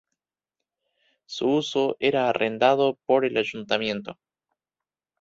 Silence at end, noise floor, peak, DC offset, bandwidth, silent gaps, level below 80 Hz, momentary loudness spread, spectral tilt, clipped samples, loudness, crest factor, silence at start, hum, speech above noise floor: 1.1 s; under -90 dBFS; -6 dBFS; under 0.1%; 7.8 kHz; none; -68 dBFS; 9 LU; -5 dB/octave; under 0.1%; -24 LUFS; 20 dB; 1.3 s; none; over 67 dB